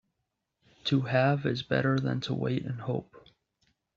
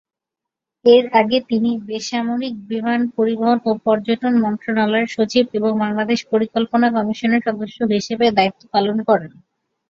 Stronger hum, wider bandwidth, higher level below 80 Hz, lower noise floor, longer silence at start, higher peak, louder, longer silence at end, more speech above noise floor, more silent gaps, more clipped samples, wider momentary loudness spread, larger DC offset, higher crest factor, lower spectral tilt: neither; about the same, 7.2 kHz vs 7.4 kHz; about the same, -64 dBFS vs -60 dBFS; about the same, -83 dBFS vs -85 dBFS; about the same, 0.85 s vs 0.85 s; second, -12 dBFS vs -2 dBFS; second, -29 LUFS vs -18 LUFS; first, 0.75 s vs 0.6 s; second, 54 dB vs 67 dB; neither; neither; first, 9 LU vs 6 LU; neither; about the same, 20 dB vs 16 dB; about the same, -5.5 dB/octave vs -5.5 dB/octave